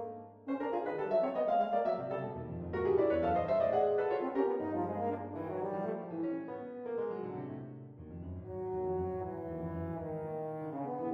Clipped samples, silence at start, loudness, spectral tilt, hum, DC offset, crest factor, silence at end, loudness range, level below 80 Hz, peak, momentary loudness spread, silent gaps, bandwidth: under 0.1%; 0 s; -35 LUFS; -10 dB/octave; none; under 0.1%; 16 dB; 0 s; 8 LU; -60 dBFS; -20 dBFS; 13 LU; none; 5.8 kHz